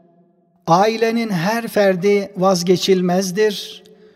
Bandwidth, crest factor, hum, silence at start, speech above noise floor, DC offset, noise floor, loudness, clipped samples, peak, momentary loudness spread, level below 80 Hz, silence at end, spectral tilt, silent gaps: 16 kHz; 16 dB; none; 0.65 s; 40 dB; under 0.1%; -56 dBFS; -17 LUFS; under 0.1%; -2 dBFS; 5 LU; -64 dBFS; 0.4 s; -5 dB/octave; none